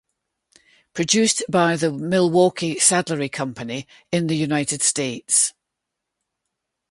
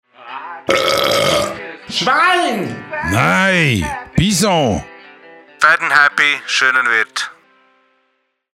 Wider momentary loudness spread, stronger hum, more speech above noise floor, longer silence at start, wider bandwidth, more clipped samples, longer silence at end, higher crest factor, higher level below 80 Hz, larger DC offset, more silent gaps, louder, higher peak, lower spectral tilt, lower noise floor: about the same, 11 LU vs 12 LU; neither; first, 61 dB vs 51 dB; first, 0.95 s vs 0.2 s; second, 11.5 kHz vs 16.5 kHz; neither; about the same, 1.4 s vs 1.3 s; about the same, 20 dB vs 16 dB; second, -62 dBFS vs -42 dBFS; neither; neither; second, -20 LUFS vs -14 LUFS; about the same, -2 dBFS vs 0 dBFS; about the same, -3.5 dB/octave vs -3.5 dB/octave; first, -81 dBFS vs -66 dBFS